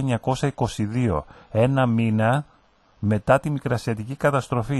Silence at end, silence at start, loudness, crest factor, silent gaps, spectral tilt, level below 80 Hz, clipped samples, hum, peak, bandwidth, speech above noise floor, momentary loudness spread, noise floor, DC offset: 0 s; 0 s; -23 LUFS; 18 dB; none; -7 dB/octave; -46 dBFS; under 0.1%; none; -4 dBFS; 12.5 kHz; 36 dB; 7 LU; -58 dBFS; under 0.1%